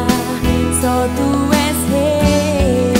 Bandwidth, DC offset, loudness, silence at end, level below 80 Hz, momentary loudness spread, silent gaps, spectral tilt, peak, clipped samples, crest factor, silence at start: 16 kHz; under 0.1%; -15 LUFS; 0 s; -26 dBFS; 3 LU; none; -5 dB/octave; 0 dBFS; under 0.1%; 14 dB; 0 s